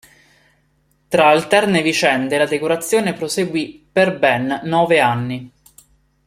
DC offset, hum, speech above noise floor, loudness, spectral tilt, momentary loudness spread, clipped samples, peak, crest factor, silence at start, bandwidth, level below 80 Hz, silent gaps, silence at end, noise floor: under 0.1%; none; 45 dB; -16 LUFS; -4.5 dB/octave; 8 LU; under 0.1%; 0 dBFS; 18 dB; 1.1 s; 16 kHz; -58 dBFS; none; 0.8 s; -61 dBFS